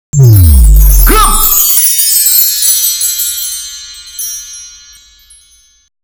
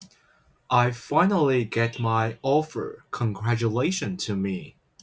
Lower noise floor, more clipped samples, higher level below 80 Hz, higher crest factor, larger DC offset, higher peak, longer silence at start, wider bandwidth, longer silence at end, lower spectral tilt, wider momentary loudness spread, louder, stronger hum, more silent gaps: second, -45 dBFS vs -62 dBFS; first, 5% vs under 0.1%; first, -12 dBFS vs -58 dBFS; second, 8 dB vs 18 dB; neither; first, 0 dBFS vs -8 dBFS; first, 0.15 s vs 0 s; first, over 20 kHz vs 8 kHz; first, 1.35 s vs 0.35 s; second, -3 dB/octave vs -6 dB/octave; first, 17 LU vs 8 LU; first, -6 LUFS vs -25 LUFS; neither; neither